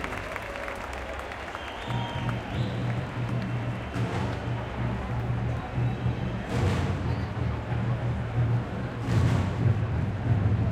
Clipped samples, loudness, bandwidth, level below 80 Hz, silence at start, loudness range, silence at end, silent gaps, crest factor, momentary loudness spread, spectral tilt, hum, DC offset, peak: under 0.1%; -30 LUFS; 10 kHz; -42 dBFS; 0 s; 4 LU; 0 s; none; 16 dB; 9 LU; -7.5 dB/octave; none; under 0.1%; -12 dBFS